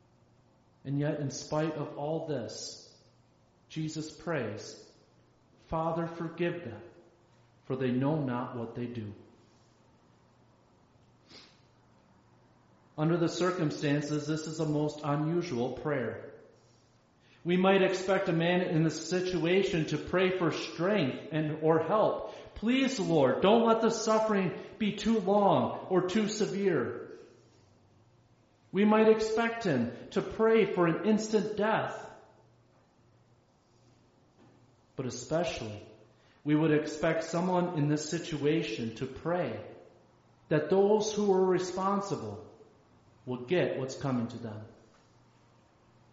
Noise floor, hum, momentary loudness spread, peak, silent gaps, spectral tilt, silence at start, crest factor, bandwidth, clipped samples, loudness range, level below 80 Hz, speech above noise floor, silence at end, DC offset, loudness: -66 dBFS; none; 15 LU; -12 dBFS; none; -5.5 dB/octave; 0.85 s; 20 dB; 8 kHz; under 0.1%; 10 LU; -64 dBFS; 36 dB; 1.4 s; under 0.1%; -30 LUFS